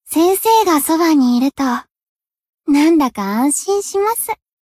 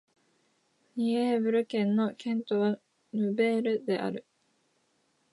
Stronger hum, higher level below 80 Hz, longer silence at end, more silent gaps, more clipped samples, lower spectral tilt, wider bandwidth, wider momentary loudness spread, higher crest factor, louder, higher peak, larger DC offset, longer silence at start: neither; first, -56 dBFS vs -84 dBFS; second, 0.25 s vs 1.1 s; first, 1.91-1.95 s, 2.03-2.16 s, 2.49-2.53 s vs none; neither; second, -3.5 dB/octave vs -7 dB/octave; first, 16 kHz vs 11.5 kHz; about the same, 8 LU vs 10 LU; about the same, 12 dB vs 16 dB; first, -15 LUFS vs -29 LUFS; first, -2 dBFS vs -14 dBFS; neither; second, 0.05 s vs 0.95 s